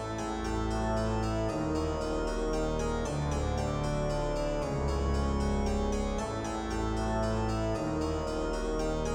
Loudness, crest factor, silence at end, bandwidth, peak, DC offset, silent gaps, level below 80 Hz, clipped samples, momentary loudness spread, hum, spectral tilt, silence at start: -32 LUFS; 12 dB; 0 s; 16 kHz; -18 dBFS; under 0.1%; none; -36 dBFS; under 0.1%; 3 LU; none; -6 dB/octave; 0 s